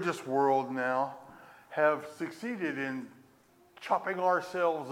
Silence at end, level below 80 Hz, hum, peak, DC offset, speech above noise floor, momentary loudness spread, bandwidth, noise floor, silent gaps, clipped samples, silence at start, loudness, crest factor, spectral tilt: 0 s; -82 dBFS; none; -14 dBFS; under 0.1%; 32 dB; 12 LU; 16.5 kHz; -63 dBFS; none; under 0.1%; 0 s; -31 LUFS; 18 dB; -5.5 dB/octave